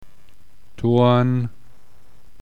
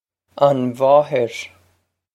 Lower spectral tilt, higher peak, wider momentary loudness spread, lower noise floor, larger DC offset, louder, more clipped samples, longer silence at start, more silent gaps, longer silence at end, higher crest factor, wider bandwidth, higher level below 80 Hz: first, -9 dB/octave vs -6.5 dB/octave; second, -6 dBFS vs 0 dBFS; second, 11 LU vs 15 LU; second, -54 dBFS vs -64 dBFS; first, 2% vs under 0.1%; about the same, -19 LUFS vs -17 LUFS; neither; first, 0.8 s vs 0.35 s; neither; first, 0.9 s vs 0.65 s; about the same, 16 dB vs 18 dB; second, 6.6 kHz vs 12.5 kHz; first, -52 dBFS vs -68 dBFS